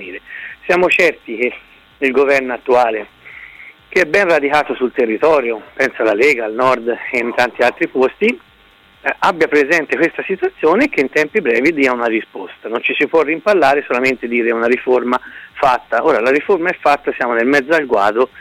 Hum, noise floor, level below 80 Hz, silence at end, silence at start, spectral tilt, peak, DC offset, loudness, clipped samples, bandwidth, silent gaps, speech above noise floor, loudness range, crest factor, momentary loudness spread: none; -48 dBFS; -54 dBFS; 0.15 s; 0 s; -4.5 dB/octave; -2 dBFS; under 0.1%; -15 LUFS; under 0.1%; 15.5 kHz; none; 33 dB; 1 LU; 12 dB; 9 LU